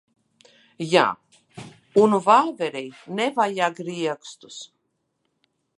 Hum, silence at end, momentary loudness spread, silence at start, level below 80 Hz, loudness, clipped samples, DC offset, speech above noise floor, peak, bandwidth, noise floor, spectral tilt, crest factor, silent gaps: none; 1.1 s; 22 LU; 0.8 s; -74 dBFS; -21 LUFS; under 0.1%; under 0.1%; 52 dB; -2 dBFS; 11.5 kHz; -74 dBFS; -5 dB/octave; 22 dB; none